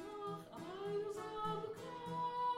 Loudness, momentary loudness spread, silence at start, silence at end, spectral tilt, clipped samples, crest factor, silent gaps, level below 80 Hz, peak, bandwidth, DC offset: -44 LUFS; 6 LU; 0 s; 0 s; -5.5 dB/octave; under 0.1%; 14 dB; none; -74 dBFS; -30 dBFS; 16 kHz; under 0.1%